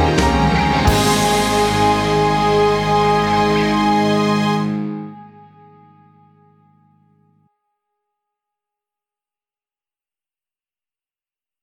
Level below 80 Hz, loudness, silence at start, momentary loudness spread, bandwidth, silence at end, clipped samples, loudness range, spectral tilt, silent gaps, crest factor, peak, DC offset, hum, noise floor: -32 dBFS; -16 LUFS; 0 s; 5 LU; 17.5 kHz; 6.35 s; under 0.1%; 12 LU; -5 dB/octave; none; 18 dB; 0 dBFS; under 0.1%; none; under -90 dBFS